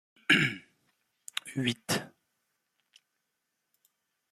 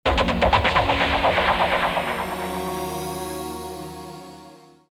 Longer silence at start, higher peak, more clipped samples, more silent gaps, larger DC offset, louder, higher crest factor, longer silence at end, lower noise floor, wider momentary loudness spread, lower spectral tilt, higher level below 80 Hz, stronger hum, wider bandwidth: first, 0.3 s vs 0.05 s; second, -8 dBFS vs -4 dBFS; neither; neither; neither; second, -29 LUFS vs -22 LUFS; first, 28 dB vs 18 dB; first, 2.25 s vs 0.35 s; first, -82 dBFS vs -47 dBFS; about the same, 17 LU vs 17 LU; about the same, -3.5 dB/octave vs -4.5 dB/octave; second, -72 dBFS vs -36 dBFS; neither; second, 15.5 kHz vs 18 kHz